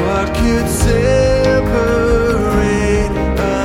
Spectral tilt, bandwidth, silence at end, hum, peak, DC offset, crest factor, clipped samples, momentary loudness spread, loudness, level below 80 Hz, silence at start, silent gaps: -6 dB/octave; 16.5 kHz; 0 s; none; 0 dBFS; under 0.1%; 12 dB; under 0.1%; 4 LU; -14 LUFS; -20 dBFS; 0 s; none